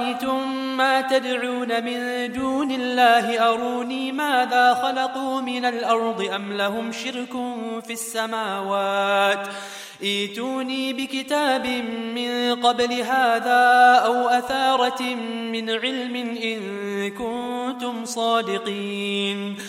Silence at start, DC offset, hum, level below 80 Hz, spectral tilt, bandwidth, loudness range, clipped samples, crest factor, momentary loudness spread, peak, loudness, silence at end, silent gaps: 0 s; under 0.1%; none; -64 dBFS; -3 dB/octave; 16 kHz; 7 LU; under 0.1%; 20 dB; 10 LU; -4 dBFS; -22 LUFS; 0 s; none